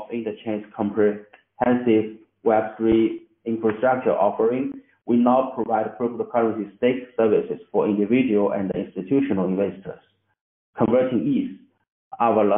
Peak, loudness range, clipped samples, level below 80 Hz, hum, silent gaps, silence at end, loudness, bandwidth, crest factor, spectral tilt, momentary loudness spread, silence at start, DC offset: -4 dBFS; 2 LU; under 0.1%; -58 dBFS; none; 10.41-10.73 s, 11.92-12.11 s; 0 s; -22 LUFS; 3.7 kHz; 18 dB; -4 dB/octave; 10 LU; 0 s; under 0.1%